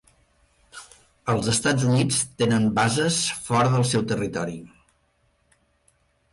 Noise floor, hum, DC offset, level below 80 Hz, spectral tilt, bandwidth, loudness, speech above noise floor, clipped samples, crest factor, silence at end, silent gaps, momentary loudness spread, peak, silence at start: -66 dBFS; none; under 0.1%; -54 dBFS; -4.5 dB/octave; 11.5 kHz; -22 LUFS; 44 dB; under 0.1%; 16 dB; 1.65 s; none; 14 LU; -10 dBFS; 0.75 s